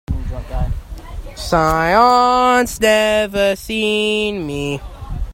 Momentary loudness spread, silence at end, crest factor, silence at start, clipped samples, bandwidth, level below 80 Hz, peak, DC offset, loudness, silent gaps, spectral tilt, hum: 17 LU; 0 s; 16 dB; 0.1 s; under 0.1%; 16.5 kHz; -28 dBFS; 0 dBFS; under 0.1%; -15 LUFS; none; -4.5 dB/octave; none